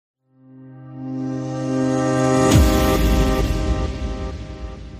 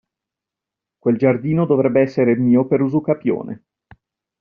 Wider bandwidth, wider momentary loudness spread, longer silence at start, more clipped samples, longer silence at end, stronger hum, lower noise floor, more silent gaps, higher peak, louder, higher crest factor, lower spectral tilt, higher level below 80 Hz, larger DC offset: first, 15.5 kHz vs 5.4 kHz; first, 18 LU vs 9 LU; second, 0.55 s vs 1.05 s; neither; second, 0 s vs 0.85 s; neither; second, -46 dBFS vs -86 dBFS; neither; about the same, 0 dBFS vs -2 dBFS; about the same, -19 LUFS vs -17 LUFS; about the same, 18 dB vs 16 dB; second, -6 dB/octave vs -9 dB/octave; first, -24 dBFS vs -58 dBFS; neither